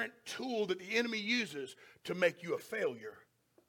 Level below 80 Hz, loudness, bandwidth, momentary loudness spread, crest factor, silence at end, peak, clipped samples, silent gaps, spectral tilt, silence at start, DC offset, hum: -84 dBFS; -36 LUFS; 17.5 kHz; 15 LU; 22 dB; 0.5 s; -16 dBFS; under 0.1%; none; -3.5 dB/octave; 0 s; under 0.1%; none